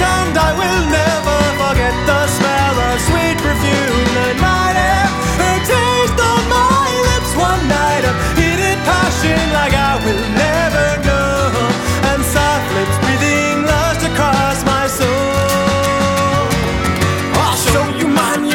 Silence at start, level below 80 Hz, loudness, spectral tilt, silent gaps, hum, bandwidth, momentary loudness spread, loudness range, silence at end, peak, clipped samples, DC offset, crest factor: 0 s; -24 dBFS; -14 LUFS; -4.5 dB/octave; none; none; 17.5 kHz; 2 LU; 1 LU; 0 s; 0 dBFS; under 0.1%; under 0.1%; 14 dB